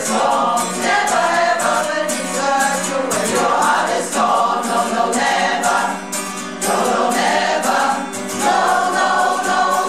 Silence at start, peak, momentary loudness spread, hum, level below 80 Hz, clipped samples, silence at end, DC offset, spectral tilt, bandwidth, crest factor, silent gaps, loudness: 0 s; -4 dBFS; 4 LU; none; -60 dBFS; under 0.1%; 0 s; 0.5%; -2 dB/octave; 16 kHz; 12 dB; none; -17 LUFS